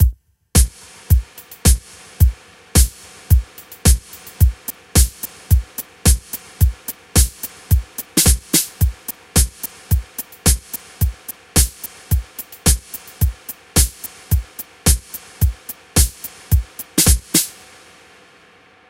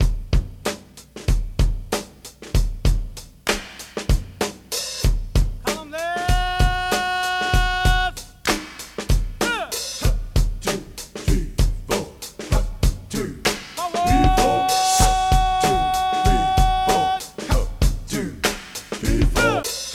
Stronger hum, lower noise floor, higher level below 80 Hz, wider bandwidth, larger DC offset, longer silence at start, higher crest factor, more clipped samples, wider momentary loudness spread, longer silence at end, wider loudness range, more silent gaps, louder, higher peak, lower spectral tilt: neither; first, -49 dBFS vs -41 dBFS; about the same, -22 dBFS vs -24 dBFS; about the same, 17.5 kHz vs 16 kHz; neither; about the same, 0 s vs 0 s; about the same, 18 dB vs 18 dB; neither; first, 15 LU vs 10 LU; first, 1.4 s vs 0 s; second, 2 LU vs 7 LU; neither; first, -18 LUFS vs -22 LUFS; about the same, 0 dBFS vs -2 dBFS; about the same, -3.5 dB/octave vs -4 dB/octave